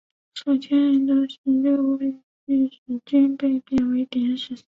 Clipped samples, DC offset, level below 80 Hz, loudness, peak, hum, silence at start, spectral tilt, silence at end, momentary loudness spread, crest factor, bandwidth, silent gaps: under 0.1%; under 0.1%; -58 dBFS; -22 LUFS; -8 dBFS; none; 0.35 s; -6.5 dB/octave; 0.15 s; 9 LU; 12 dB; 7.4 kHz; 1.38-1.44 s, 2.23-2.47 s, 2.78-2.86 s